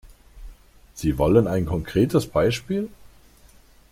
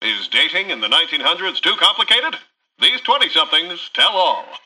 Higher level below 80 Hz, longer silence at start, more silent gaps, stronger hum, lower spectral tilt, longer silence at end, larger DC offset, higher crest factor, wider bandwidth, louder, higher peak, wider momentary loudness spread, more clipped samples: first, -40 dBFS vs -72 dBFS; about the same, 0.05 s vs 0 s; neither; neither; first, -7 dB/octave vs -0.5 dB/octave; first, 1.05 s vs 0.05 s; neither; about the same, 20 dB vs 16 dB; first, 16 kHz vs 12.5 kHz; second, -22 LUFS vs -15 LUFS; about the same, -4 dBFS vs -2 dBFS; first, 10 LU vs 6 LU; neither